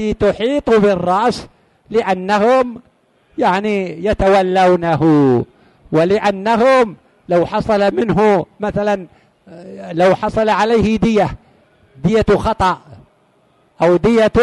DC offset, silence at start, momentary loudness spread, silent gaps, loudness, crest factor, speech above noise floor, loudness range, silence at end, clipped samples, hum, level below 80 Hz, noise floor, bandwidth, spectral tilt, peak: under 0.1%; 0 s; 8 LU; none; -15 LUFS; 12 dB; 41 dB; 3 LU; 0 s; under 0.1%; none; -38 dBFS; -55 dBFS; 11.5 kHz; -7 dB/octave; -2 dBFS